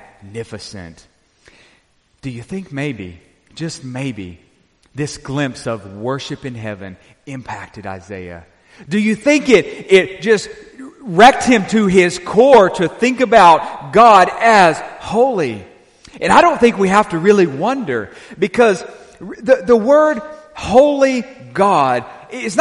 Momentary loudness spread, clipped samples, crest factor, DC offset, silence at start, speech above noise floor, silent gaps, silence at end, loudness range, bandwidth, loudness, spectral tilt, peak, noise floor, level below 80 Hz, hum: 22 LU; under 0.1%; 14 dB; under 0.1%; 0.25 s; 43 dB; none; 0 s; 17 LU; 11.5 kHz; -13 LUFS; -5 dB/octave; 0 dBFS; -57 dBFS; -48 dBFS; none